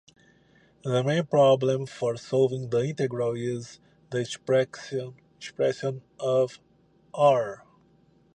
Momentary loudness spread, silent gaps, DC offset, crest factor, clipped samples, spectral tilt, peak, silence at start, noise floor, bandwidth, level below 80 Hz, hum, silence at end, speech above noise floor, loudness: 16 LU; none; under 0.1%; 18 dB; under 0.1%; -6 dB/octave; -8 dBFS; 0.85 s; -61 dBFS; 9.6 kHz; -70 dBFS; none; 0.8 s; 36 dB; -26 LUFS